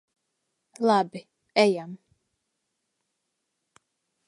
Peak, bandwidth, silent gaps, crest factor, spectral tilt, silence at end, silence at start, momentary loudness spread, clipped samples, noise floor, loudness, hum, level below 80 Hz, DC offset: -6 dBFS; 11.5 kHz; none; 24 dB; -5 dB/octave; 2.3 s; 0.8 s; 18 LU; under 0.1%; -80 dBFS; -25 LUFS; none; -82 dBFS; under 0.1%